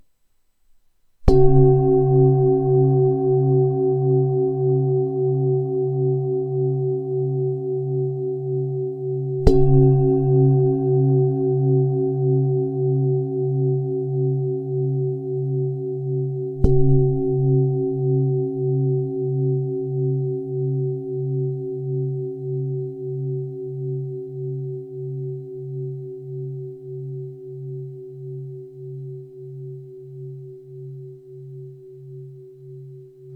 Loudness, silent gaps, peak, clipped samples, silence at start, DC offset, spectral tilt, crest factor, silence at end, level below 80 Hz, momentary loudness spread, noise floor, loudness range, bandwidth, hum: -21 LUFS; none; 0 dBFS; under 0.1%; 1.2 s; under 0.1%; -12 dB/octave; 20 dB; 0 s; -34 dBFS; 20 LU; -62 dBFS; 17 LU; 5 kHz; none